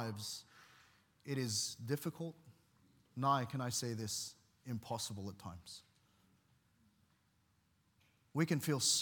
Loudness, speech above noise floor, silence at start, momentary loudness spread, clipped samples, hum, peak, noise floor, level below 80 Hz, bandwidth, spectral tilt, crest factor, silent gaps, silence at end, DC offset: -40 LUFS; 37 dB; 0 s; 17 LU; under 0.1%; none; -20 dBFS; -76 dBFS; -80 dBFS; 18 kHz; -3.5 dB/octave; 22 dB; none; 0 s; under 0.1%